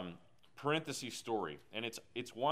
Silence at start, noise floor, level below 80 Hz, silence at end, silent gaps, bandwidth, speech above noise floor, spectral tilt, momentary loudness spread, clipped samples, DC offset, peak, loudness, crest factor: 0 s; -60 dBFS; -78 dBFS; 0 s; none; 15.5 kHz; 20 dB; -4 dB/octave; 9 LU; under 0.1%; under 0.1%; -20 dBFS; -41 LUFS; 20 dB